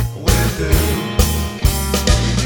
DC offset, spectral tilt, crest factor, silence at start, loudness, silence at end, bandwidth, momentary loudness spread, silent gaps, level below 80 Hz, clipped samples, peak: under 0.1%; -4.5 dB/octave; 16 dB; 0 s; -17 LUFS; 0 s; over 20 kHz; 3 LU; none; -20 dBFS; under 0.1%; 0 dBFS